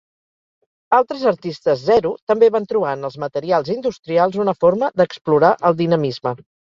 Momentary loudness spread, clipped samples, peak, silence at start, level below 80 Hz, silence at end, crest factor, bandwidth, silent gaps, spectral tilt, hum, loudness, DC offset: 9 LU; under 0.1%; -2 dBFS; 0.9 s; -58 dBFS; 0.4 s; 16 dB; 7.2 kHz; 2.22-2.27 s, 3.99-4.03 s, 5.21-5.25 s; -7.5 dB/octave; none; -18 LUFS; under 0.1%